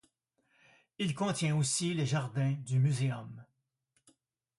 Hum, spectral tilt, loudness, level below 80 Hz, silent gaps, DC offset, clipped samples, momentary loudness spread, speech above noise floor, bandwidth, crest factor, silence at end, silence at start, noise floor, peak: none; -5 dB/octave; -32 LUFS; -70 dBFS; none; under 0.1%; under 0.1%; 10 LU; 50 dB; 11.5 kHz; 16 dB; 1.15 s; 1 s; -81 dBFS; -18 dBFS